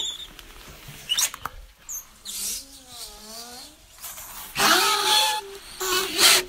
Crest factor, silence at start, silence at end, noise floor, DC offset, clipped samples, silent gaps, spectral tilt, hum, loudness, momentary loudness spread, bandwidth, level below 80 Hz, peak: 24 dB; 0 s; 0 s; -45 dBFS; under 0.1%; under 0.1%; none; 0.5 dB/octave; none; -21 LUFS; 23 LU; 16 kHz; -52 dBFS; -2 dBFS